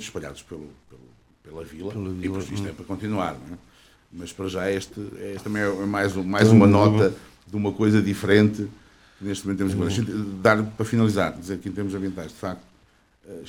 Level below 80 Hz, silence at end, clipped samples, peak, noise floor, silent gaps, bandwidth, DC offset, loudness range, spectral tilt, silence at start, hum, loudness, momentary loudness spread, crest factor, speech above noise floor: -54 dBFS; 0 s; under 0.1%; -2 dBFS; -59 dBFS; none; 15 kHz; under 0.1%; 13 LU; -6.5 dB/octave; 0 s; none; -23 LUFS; 21 LU; 22 dB; 36 dB